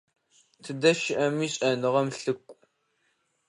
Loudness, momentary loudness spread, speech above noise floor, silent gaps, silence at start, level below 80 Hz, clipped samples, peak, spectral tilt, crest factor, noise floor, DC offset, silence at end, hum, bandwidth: -26 LUFS; 13 LU; 47 dB; none; 0.65 s; -74 dBFS; under 0.1%; -8 dBFS; -4.5 dB/octave; 22 dB; -73 dBFS; under 0.1%; 0.95 s; none; 11 kHz